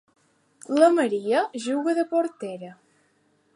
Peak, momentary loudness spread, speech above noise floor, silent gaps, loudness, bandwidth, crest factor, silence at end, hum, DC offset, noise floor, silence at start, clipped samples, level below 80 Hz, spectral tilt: -6 dBFS; 17 LU; 43 dB; none; -23 LUFS; 11.5 kHz; 20 dB; 0.85 s; none; under 0.1%; -66 dBFS; 0.7 s; under 0.1%; -84 dBFS; -4.5 dB/octave